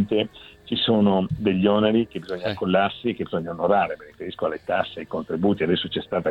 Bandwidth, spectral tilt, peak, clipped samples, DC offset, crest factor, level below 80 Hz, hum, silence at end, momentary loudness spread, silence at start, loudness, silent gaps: 5.4 kHz; -8 dB/octave; -6 dBFS; under 0.1%; under 0.1%; 18 dB; -54 dBFS; none; 0 s; 10 LU; 0 s; -23 LUFS; none